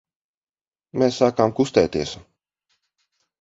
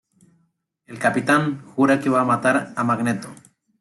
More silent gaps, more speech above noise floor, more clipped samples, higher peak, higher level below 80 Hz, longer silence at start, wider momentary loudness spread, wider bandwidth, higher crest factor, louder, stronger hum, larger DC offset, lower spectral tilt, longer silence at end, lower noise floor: neither; first, over 70 dB vs 48 dB; neither; first, -2 dBFS vs -6 dBFS; first, -52 dBFS vs -64 dBFS; about the same, 0.95 s vs 0.9 s; first, 13 LU vs 10 LU; second, 7.8 kHz vs 12 kHz; first, 22 dB vs 16 dB; about the same, -21 LUFS vs -20 LUFS; neither; neither; about the same, -5.5 dB/octave vs -6 dB/octave; first, 1.2 s vs 0.45 s; first, under -90 dBFS vs -68 dBFS